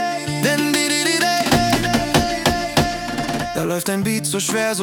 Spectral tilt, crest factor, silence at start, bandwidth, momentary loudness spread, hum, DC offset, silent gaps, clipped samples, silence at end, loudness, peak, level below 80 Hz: -3.5 dB/octave; 18 dB; 0 s; 18 kHz; 6 LU; none; under 0.1%; none; under 0.1%; 0 s; -18 LUFS; 0 dBFS; -38 dBFS